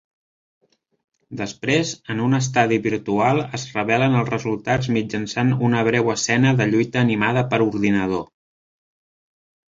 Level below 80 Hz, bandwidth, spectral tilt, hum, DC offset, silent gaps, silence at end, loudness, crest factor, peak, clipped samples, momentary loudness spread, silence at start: -54 dBFS; 7.8 kHz; -5.5 dB/octave; none; under 0.1%; none; 1.45 s; -20 LUFS; 18 dB; -2 dBFS; under 0.1%; 8 LU; 1.3 s